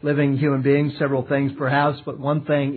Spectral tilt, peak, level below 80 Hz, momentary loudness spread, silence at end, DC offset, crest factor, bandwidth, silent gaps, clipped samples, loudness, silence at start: -11.5 dB/octave; -6 dBFS; -64 dBFS; 5 LU; 0 s; under 0.1%; 14 dB; 4.5 kHz; none; under 0.1%; -21 LUFS; 0 s